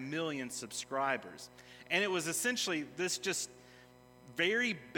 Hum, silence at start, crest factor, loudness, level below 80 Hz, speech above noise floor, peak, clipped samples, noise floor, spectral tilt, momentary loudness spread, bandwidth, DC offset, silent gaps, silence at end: none; 0 s; 20 dB; -35 LUFS; -76 dBFS; 23 dB; -16 dBFS; under 0.1%; -59 dBFS; -2.5 dB/octave; 14 LU; 18 kHz; under 0.1%; none; 0 s